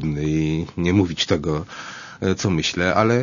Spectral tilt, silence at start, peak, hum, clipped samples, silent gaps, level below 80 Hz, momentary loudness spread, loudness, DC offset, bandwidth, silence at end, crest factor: -5.5 dB/octave; 0 s; -2 dBFS; none; under 0.1%; none; -42 dBFS; 10 LU; -21 LUFS; under 0.1%; 7.4 kHz; 0 s; 18 dB